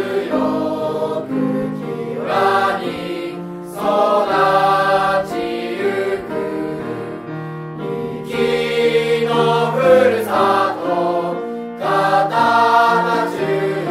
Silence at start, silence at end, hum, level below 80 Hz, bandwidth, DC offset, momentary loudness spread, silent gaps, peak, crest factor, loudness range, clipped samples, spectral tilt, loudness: 0 s; 0 s; none; -56 dBFS; 15.5 kHz; under 0.1%; 12 LU; none; -2 dBFS; 16 dB; 5 LU; under 0.1%; -5.5 dB/octave; -17 LUFS